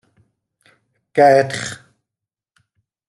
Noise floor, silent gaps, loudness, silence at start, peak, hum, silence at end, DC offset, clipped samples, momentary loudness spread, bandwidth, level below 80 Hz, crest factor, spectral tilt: -86 dBFS; none; -16 LUFS; 1.15 s; -2 dBFS; none; 1.35 s; under 0.1%; under 0.1%; 18 LU; 12 kHz; -66 dBFS; 20 dB; -4.5 dB/octave